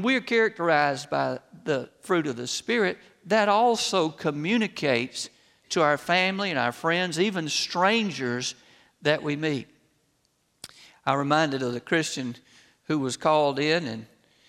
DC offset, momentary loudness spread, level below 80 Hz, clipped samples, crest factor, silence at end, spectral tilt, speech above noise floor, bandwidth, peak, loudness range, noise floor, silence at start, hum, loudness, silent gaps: under 0.1%; 11 LU; -72 dBFS; under 0.1%; 20 dB; 0.45 s; -4 dB/octave; 45 dB; 15.5 kHz; -6 dBFS; 4 LU; -70 dBFS; 0 s; none; -25 LUFS; none